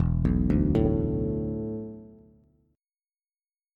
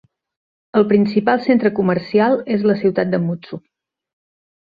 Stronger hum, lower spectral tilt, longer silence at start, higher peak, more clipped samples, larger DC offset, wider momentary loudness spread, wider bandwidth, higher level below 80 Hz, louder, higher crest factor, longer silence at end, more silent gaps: neither; first, -11.5 dB/octave vs -9.5 dB/octave; second, 0 s vs 0.75 s; second, -10 dBFS vs -2 dBFS; neither; neither; first, 14 LU vs 9 LU; about the same, 5 kHz vs 5 kHz; first, -36 dBFS vs -58 dBFS; second, -27 LUFS vs -17 LUFS; about the same, 18 dB vs 16 dB; first, 1.65 s vs 1.1 s; neither